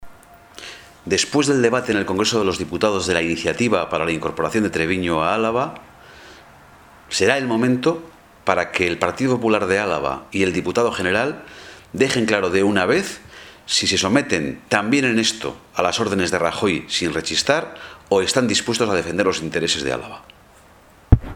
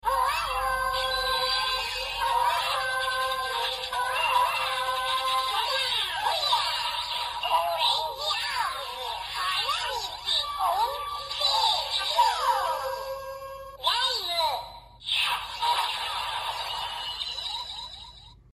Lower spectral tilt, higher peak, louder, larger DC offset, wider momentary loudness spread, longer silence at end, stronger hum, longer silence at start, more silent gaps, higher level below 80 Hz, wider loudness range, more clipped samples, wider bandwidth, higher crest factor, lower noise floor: first, -4 dB/octave vs 0.5 dB/octave; first, 0 dBFS vs -10 dBFS; first, -20 LUFS vs -26 LUFS; neither; first, 12 LU vs 9 LU; second, 0 s vs 0.2 s; neither; about the same, 0 s vs 0.05 s; neither; first, -36 dBFS vs -52 dBFS; about the same, 3 LU vs 3 LU; neither; first, 17 kHz vs 15 kHz; about the same, 20 dB vs 18 dB; about the same, -49 dBFS vs -48 dBFS